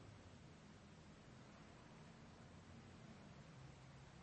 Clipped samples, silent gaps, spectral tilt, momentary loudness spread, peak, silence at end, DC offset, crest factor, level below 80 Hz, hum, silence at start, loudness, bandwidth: under 0.1%; none; -5.5 dB/octave; 2 LU; -48 dBFS; 0 s; under 0.1%; 14 dB; -74 dBFS; none; 0 s; -62 LUFS; 8.4 kHz